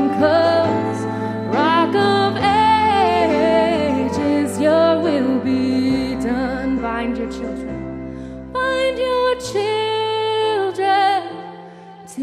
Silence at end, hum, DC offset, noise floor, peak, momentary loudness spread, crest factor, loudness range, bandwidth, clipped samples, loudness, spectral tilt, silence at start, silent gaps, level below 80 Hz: 0 s; none; under 0.1%; -38 dBFS; -4 dBFS; 12 LU; 14 dB; 6 LU; 13 kHz; under 0.1%; -18 LUFS; -5.5 dB/octave; 0 s; none; -44 dBFS